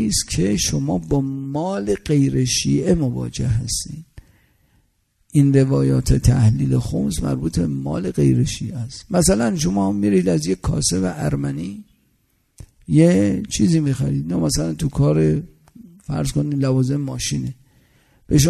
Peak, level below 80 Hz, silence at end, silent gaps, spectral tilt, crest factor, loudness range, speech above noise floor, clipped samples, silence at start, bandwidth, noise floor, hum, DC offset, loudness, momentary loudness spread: -2 dBFS; -34 dBFS; 0 s; none; -6 dB/octave; 18 dB; 3 LU; 46 dB; under 0.1%; 0 s; 13.5 kHz; -64 dBFS; none; under 0.1%; -19 LUFS; 9 LU